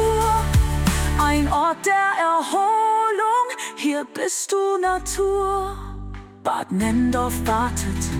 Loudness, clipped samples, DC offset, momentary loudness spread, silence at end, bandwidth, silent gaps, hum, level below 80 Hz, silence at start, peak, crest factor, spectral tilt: -21 LUFS; under 0.1%; under 0.1%; 7 LU; 0 s; 18 kHz; none; none; -30 dBFS; 0 s; -6 dBFS; 14 dB; -5 dB/octave